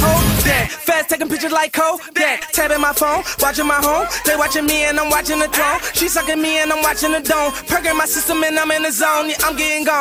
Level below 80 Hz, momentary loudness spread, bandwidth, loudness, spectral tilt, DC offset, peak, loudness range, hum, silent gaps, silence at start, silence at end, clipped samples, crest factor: -34 dBFS; 2 LU; 20 kHz; -16 LUFS; -3 dB/octave; under 0.1%; -4 dBFS; 1 LU; none; none; 0 s; 0 s; under 0.1%; 14 dB